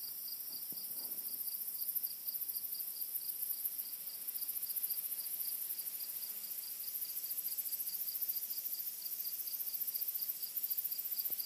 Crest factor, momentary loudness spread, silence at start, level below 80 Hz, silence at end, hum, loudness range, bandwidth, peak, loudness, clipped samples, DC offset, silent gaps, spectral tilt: 20 dB; 4 LU; 0 s; under -90 dBFS; 0 s; none; 1 LU; 15.5 kHz; -22 dBFS; -38 LUFS; under 0.1%; under 0.1%; none; 1.5 dB/octave